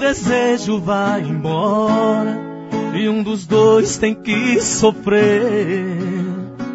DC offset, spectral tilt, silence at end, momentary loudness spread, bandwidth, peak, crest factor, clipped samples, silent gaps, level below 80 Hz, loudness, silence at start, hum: under 0.1%; -5 dB/octave; 0 s; 9 LU; 8 kHz; 0 dBFS; 16 dB; under 0.1%; none; -48 dBFS; -17 LUFS; 0 s; none